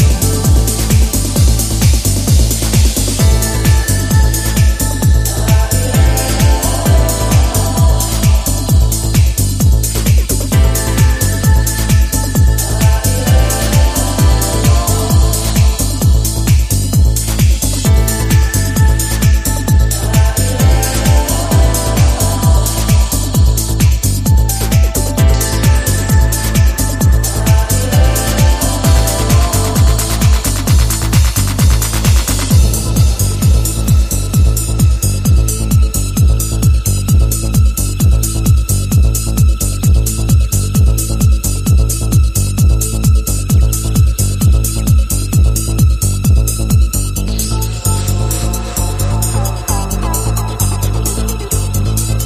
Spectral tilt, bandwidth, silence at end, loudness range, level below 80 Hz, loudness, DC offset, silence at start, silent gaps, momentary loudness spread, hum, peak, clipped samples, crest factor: -4.5 dB/octave; 15.5 kHz; 0 s; 1 LU; -14 dBFS; -12 LUFS; under 0.1%; 0 s; none; 3 LU; none; 0 dBFS; under 0.1%; 10 dB